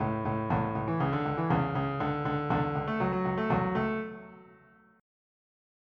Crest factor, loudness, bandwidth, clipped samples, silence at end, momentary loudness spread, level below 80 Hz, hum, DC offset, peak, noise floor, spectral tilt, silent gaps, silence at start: 16 dB; -30 LUFS; 6 kHz; under 0.1%; 1.45 s; 4 LU; -52 dBFS; none; under 0.1%; -16 dBFS; -59 dBFS; -9.5 dB/octave; none; 0 s